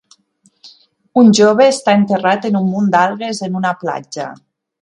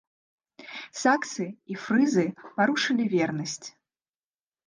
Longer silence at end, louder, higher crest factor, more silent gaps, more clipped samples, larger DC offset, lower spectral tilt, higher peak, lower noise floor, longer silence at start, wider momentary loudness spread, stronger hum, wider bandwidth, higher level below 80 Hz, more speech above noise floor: second, 0.45 s vs 1 s; first, -13 LUFS vs -26 LUFS; second, 14 dB vs 20 dB; neither; neither; neither; about the same, -5.5 dB/octave vs -4.5 dB/octave; first, 0 dBFS vs -8 dBFS; second, -57 dBFS vs under -90 dBFS; about the same, 0.65 s vs 0.6 s; about the same, 14 LU vs 15 LU; neither; about the same, 11 kHz vs 10 kHz; first, -62 dBFS vs -76 dBFS; second, 44 dB vs over 64 dB